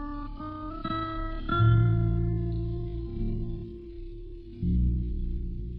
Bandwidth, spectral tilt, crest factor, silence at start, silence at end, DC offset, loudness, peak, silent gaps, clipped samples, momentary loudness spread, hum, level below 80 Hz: 4.7 kHz; -11 dB/octave; 16 dB; 0 s; 0 s; under 0.1%; -30 LUFS; -12 dBFS; none; under 0.1%; 19 LU; none; -34 dBFS